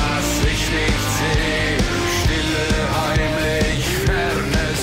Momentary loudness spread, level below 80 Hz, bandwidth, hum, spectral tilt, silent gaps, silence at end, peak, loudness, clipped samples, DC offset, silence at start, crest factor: 1 LU; -26 dBFS; 16.5 kHz; none; -4 dB/octave; none; 0 s; -8 dBFS; -19 LUFS; under 0.1%; under 0.1%; 0 s; 10 dB